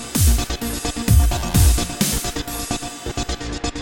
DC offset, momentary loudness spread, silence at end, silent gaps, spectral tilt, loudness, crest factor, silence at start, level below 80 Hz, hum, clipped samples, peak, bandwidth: under 0.1%; 10 LU; 0 s; none; -4 dB/octave; -20 LUFS; 16 dB; 0 s; -22 dBFS; none; under 0.1%; -2 dBFS; 17 kHz